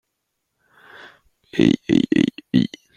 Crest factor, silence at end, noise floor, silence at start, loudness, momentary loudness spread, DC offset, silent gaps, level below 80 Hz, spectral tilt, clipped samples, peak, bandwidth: 20 dB; 0.3 s; -76 dBFS; 1.55 s; -19 LUFS; 4 LU; under 0.1%; none; -54 dBFS; -6.5 dB/octave; under 0.1%; -2 dBFS; 9.8 kHz